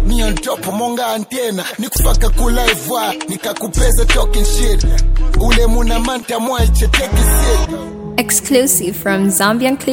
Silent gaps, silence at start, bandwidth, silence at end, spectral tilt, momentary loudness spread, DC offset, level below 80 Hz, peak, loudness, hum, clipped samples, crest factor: none; 0 s; 17 kHz; 0 s; -4 dB/octave; 7 LU; under 0.1%; -14 dBFS; 0 dBFS; -15 LUFS; none; under 0.1%; 12 dB